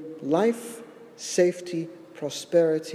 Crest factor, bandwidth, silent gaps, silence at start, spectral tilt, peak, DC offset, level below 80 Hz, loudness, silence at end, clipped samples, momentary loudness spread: 18 dB; 14.5 kHz; none; 0 s; -5 dB/octave; -10 dBFS; under 0.1%; -80 dBFS; -26 LUFS; 0 s; under 0.1%; 17 LU